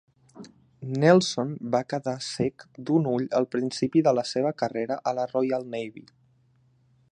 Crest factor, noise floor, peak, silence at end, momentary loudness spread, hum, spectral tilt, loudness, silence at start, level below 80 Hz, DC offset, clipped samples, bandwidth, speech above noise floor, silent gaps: 22 dB; -63 dBFS; -4 dBFS; 1.1 s; 12 LU; none; -6 dB/octave; -26 LUFS; 0.35 s; -68 dBFS; under 0.1%; under 0.1%; 10.5 kHz; 38 dB; none